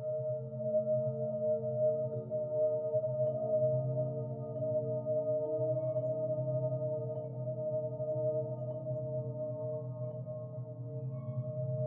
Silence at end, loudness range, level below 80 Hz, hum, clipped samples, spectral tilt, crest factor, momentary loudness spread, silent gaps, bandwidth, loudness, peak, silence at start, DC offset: 0 s; 5 LU; -78 dBFS; none; under 0.1%; -13.5 dB/octave; 14 dB; 8 LU; none; 1.4 kHz; -36 LUFS; -22 dBFS; 0 s; under 0.1%